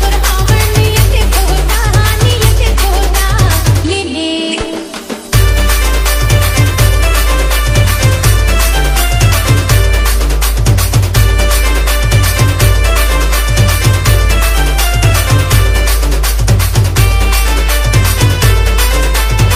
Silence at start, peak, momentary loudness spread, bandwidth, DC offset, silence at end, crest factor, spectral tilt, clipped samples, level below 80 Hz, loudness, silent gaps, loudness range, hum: 0 s; 0 dBFS; 3 LU; 16.5 kHz; under 0.1%; 0 s; 8 dB; -4 dB/octave; 0.4%; -12 dBFS; -11 LUFS; none; 2 LU; none